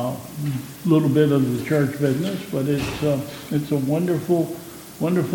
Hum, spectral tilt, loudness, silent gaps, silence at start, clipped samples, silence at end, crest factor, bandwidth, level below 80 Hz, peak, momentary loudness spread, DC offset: none; -7 dB/octave; -22 LUFS; none; 0 s; under 0.1%; 0 s; 16 dB; 17.5 kHz; -52 dBFS; -4 dBFS; 10 LU; under 0.1%